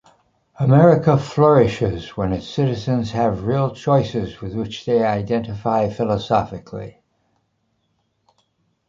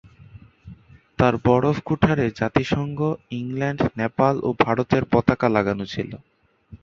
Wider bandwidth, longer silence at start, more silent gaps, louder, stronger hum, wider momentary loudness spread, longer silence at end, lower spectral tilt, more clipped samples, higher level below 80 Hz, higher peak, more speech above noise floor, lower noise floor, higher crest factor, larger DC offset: about the same, 7.6 kHz vs 7.4 kHz; first, 0.6 s vs 0.2 s; neither; first, -19 LUFS vs -22 LUFS; neither; first, 14 LU vs 10 LU; first, 2 s vs 0.05 s; about the same, -8 dB/octave vs -8 dB/octave; neither; about the same, -46 dBFS vs -46 dBFS; about the same, -2 dBFS vs -2 dBFS; first, 50 dB vs 26 dB; first, -68 dBFS vs -47 dBFS; about the same, 18 dB vs 20 dB; neither